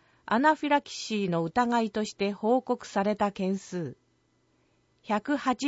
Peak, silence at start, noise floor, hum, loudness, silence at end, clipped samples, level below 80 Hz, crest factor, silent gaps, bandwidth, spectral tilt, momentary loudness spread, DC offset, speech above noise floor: -10 dBFS; 0.25 s; -70 dBFS; none; -28 LUFS; 0 s; under 0.1%; -66 dBFS; 18 dB; none; 8 kHz; -5.5 dB/octave; 8 LU; under 0.1%; 42 dB